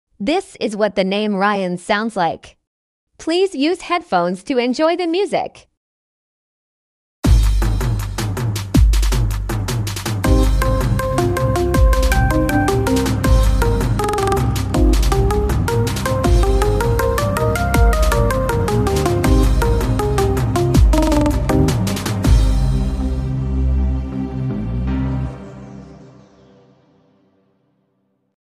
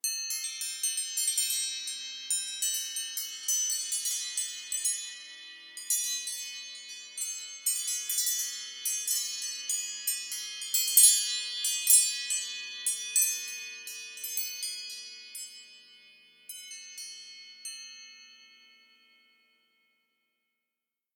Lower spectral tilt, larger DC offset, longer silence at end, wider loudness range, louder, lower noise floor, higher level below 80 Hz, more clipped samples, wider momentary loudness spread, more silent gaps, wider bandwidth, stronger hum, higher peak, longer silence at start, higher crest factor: first, -6 dB/octave vs 6.5 dB/octave; neither; about the same, 2.5 s vs 2.6 s; second, 6 LU vs 20 LU; first, -18 LUFS vs -28 LUFS; second, -66 dBFS vs -89 dBFS; first, -20 dBFS vs under -90 dBFS; neither; second, 7 LU vs 17 LU; first, 2.67-3.07 s, 5.77-7.22 s vs none; second, 15.5 kHz vs 19.5 kHz; neither; about the same, -2 dBFS vs -4 dBFS; first, 0.2 s vs 0.05 s; second, 14 dB vs 30 dB